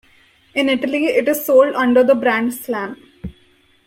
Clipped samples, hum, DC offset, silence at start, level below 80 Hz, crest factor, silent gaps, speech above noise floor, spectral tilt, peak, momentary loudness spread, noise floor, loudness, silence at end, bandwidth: under 0.1%; none; under 0.1%; 0.55 s; -52 dBFS; 16 dB; none; 39 dB; -4 dB/octave; -2 dBFS; 21 LU; -54 dBFS; -16 LUFS; 0.55 s; 16.5 kHz